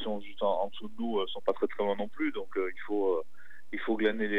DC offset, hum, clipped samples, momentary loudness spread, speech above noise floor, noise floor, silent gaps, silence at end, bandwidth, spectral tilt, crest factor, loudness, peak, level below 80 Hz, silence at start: 2%; 60 Hz at -70 dBFS; under 0.1%; 8 LU; 26 dB; -57 dBFS; none; 0 s; 8.6 kHz; -6.5 dB/octave; 18 dB; -33 LUFS; -14 dBFS; -76 dBFS; 0 s